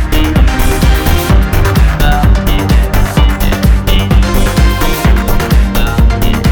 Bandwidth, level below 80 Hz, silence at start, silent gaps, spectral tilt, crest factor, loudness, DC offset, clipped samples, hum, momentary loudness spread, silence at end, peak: over 20 kHz; -10 dBFS; 0 s; none; -5.5 dB/octave; 8 dB; -11 LUFS; under 0.1%; under 0.1%; none; 2 LU; 0 s; 0 dBFS